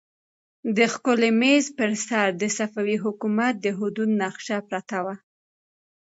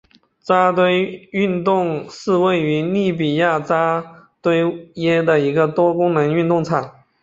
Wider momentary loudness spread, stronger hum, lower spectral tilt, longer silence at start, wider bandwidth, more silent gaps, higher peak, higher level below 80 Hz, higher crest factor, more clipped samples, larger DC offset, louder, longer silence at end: about the same, 10 LU vs 8 LU; neither; second, -4 dB/octave vs -7 dB/octave; first, 0.65 s vs 0.45 s; about the same, 8 kHz vs 7.8 kHz; neither; second, -6 dBFS vs -2 dBFS; second, -76 dBFS vs -60 dBFS; about the same, 18 dB vs 16 dB; neither; neither; second, -23 LUFS vs -18 LUFS; first, 0.95 s vs 0.3 s